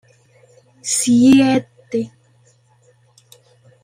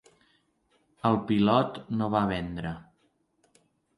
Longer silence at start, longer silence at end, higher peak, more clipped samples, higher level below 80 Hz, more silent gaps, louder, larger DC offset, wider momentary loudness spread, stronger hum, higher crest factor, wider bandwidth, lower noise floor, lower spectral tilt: second, 0.85 s vs 1.05 s; first, 1.75 s vs 1.15 s; first, -2 dBFS vs -8 dBFS; neither; about the same, -58 dBFS vs -56 dBFS; neither; first, -15 LUFS vs -27 LUFS; neither; first, 17 LU vs 13 LU; neither; second, 16 dB vs 22 dB; first, 16 kHz vs 11 kHz; second, -55 dBFS vs -71 dBFS; second, -4 dB/octave vs -8 dB/octave